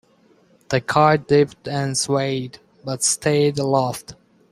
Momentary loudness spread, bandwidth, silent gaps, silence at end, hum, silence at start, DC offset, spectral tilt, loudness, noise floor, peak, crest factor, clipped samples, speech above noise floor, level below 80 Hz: 13 LU; 15.5 kHz; none; 0.4 s; none; 0.7 s; under 0.1%; -4.5 dB/octave; -20 LUFS; -56 dBFS; -2 dBFS; 20 dB; under 0.1%; 37 dB; -56 dBFS